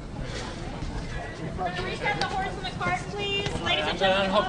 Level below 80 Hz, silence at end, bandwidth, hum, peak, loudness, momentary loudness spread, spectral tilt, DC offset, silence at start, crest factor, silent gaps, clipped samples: -40 dBFS; 0 s; 10.5 kHz; none; -8 dBFS; -28 LUFS; 12 LU; -4.5 dB/octave; under 0.1%; 0 s; 20 dB; none; under 0.1%